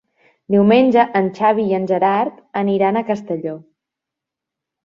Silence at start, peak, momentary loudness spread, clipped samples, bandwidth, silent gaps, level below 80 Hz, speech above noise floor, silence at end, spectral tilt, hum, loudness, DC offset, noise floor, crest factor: 0.5 s; -2 dBFS; 12 LU; under 0.1%; 7 kHz; none; -62 dBFS; 68 dB; 1.25 s; -8 dB/octave; none; -17 LUFS; under 0.1%; -84 dBFS; 16 dB